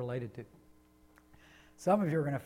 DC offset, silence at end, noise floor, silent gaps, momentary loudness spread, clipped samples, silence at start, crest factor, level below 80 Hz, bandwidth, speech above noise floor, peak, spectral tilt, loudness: under 0.1%; 0 s; -63 dBFS; none; 21 LU; under 0.1%; 0 s; 18 dB; -68 dBFS; 16 kHz; 30 dB; -18 dBFS; -8 dB/octave; -33 LUFS